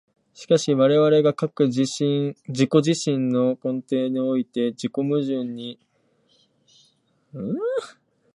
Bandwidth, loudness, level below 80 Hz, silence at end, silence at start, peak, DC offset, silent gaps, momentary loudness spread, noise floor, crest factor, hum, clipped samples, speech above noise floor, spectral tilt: 11 kHz; -22 LUFS; -72 dBFS; 0.45 s; 0.4 s; -4 dBFS; under 0.1%; none; 12 LU; -64 dBFS; 20 dB; none; under 0.1%; 43 dB; -6 dB/octave